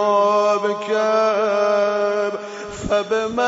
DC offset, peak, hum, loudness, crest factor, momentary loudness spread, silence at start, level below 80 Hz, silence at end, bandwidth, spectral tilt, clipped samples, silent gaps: under 0.1%; -6 dBFS; none; -19 LUFS; 12 dB; 9 LU; 0 s; -50 dBFS; 0 s; 8 kHz; -4 dB/octave; under 0.1%; none